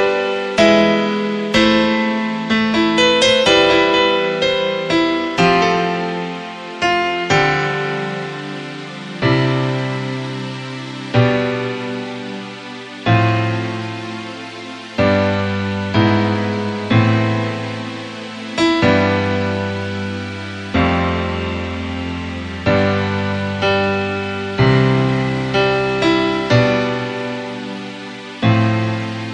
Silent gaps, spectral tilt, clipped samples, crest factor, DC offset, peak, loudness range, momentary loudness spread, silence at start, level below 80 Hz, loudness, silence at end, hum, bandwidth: none; -6 dB/octave; under 0.1%; 16 dB; under 0.1%; 0 dBFS; 7 LU; 14 LU; 0 s; -42 dBFS; -17 LUFS; 0 s; none; 10 kHz